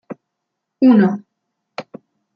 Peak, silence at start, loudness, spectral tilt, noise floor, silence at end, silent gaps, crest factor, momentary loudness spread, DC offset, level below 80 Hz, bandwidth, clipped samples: -2 dBFS; 0.1 s; -14 LUFS; -9 dB/octave; -78 dBFS; 0.55 s; none; 16 dB; 25 LU; under 0.1%; -68 dBFS; 5.4 kHz; under 0.1%